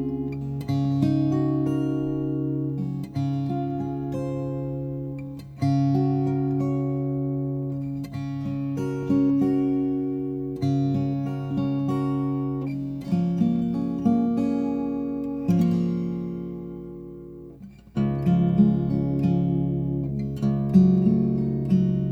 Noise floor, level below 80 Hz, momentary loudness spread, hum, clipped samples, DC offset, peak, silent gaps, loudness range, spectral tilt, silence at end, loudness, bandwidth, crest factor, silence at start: -44 dBFS; -48 dBFS; 10 LU; none; under 0.1%; under 0.1%; -6 dBFS; none; 5 LU; -10 dB/octave; 0 s; -25 LUFS; 6.6 kHz; 18 dB; 0 s